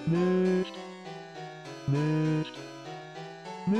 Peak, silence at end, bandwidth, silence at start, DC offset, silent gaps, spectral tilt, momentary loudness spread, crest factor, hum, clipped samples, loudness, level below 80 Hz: -18 dBFS; 0 s; 10 kHz; 0 s; under 0.1%; none; -7.5 dB/octave; 16 LU; 14 dB; none; under 0.1%; -29 LUFS; -68 dBFS